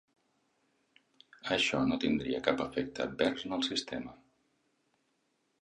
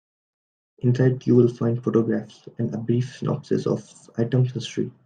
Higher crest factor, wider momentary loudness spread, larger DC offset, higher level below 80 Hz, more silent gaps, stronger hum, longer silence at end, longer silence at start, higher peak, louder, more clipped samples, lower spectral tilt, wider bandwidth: first, 26 dB vs 18 dB; about the same, 12 LU vs 11 LU; neither; about the same, -64 dBFS vs -64 dBFS; neither; neither; first, 1.45 s vs 0.15 s; first, 1.45 s vs 0.85 s; second, -10 dBFS vs -4 dBFS; second, -33 LUFS vs -23 LUFS; neither; second, -4 dB/octave vs -8 dB/octave; first, 10.5 kHz vs 9.2 kHz